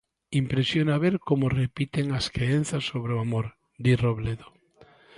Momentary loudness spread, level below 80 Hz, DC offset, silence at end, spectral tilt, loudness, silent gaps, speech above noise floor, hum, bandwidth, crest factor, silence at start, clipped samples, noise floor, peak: 7 LU; -50 dBFS; under 0.1%; 0.75 s; -6.5 dB/octave; -26 LUFS; none; 31 dB; none; 11.5 kHz; 16 dB; 0.3 s; under 0.1%; -56 dBFS; -10 dBFS